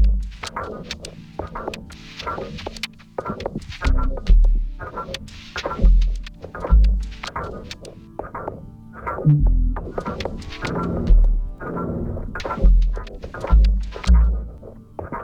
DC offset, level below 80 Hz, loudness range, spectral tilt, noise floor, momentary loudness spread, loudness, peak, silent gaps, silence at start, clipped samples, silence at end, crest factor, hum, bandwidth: under 0.1%; -20 dBFS; 6 LU; -6.5 dB/octave; -39 dBFS; 16 LU; -24 LUFS; -4 dBFS; none; 0 s; under 0.1%; 0 s; 16 dB; none; 8.2 kHz